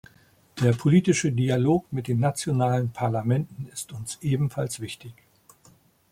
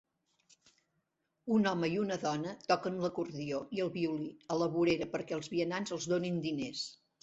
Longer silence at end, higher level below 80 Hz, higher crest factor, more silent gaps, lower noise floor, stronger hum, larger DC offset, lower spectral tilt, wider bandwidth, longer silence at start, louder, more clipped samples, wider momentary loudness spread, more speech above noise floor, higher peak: first, 1 s vs 0.25 s; first, -58 dBFS vs -72 dBFS; about the same, 18 dB vs 20 dB; neither; second, -58 dBFS vs -82 dBFS; neither; neither; about the same, -6.5 dB/octave vs -5.5 dB/octave; first, 15.5 kHz vs 8 kHz; second, 0.55 s vs 1.45 s; first, -25 LUFS vs -35 LUFS; neither; first, 14 LU vs 8 LU; second, 34 dB vs 48 dB; first, -8 dBFS vs -16 dBFS